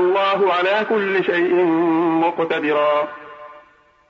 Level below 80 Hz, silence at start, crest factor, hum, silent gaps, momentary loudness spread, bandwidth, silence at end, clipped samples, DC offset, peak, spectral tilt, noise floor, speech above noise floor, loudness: -68 dBFS; 0 s; 12 dB; none; none; 5 LU; 6.4 kHz; 0.5 s; under 0.1%; under 0.1%; -6 dBFS; -7 dB/octave; -52 dBFS; 35 dB; -18 LUFS